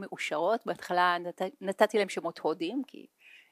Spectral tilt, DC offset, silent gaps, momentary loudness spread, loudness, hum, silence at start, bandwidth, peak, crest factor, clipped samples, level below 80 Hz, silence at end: -4 dB/octave; under 0.1%; none; 9 LU; -30 LUFS; none; 0 s; 15.5 kHz; -8 dBFS; 22 dB; under 0.1%; -86 dBFS; 0.15 s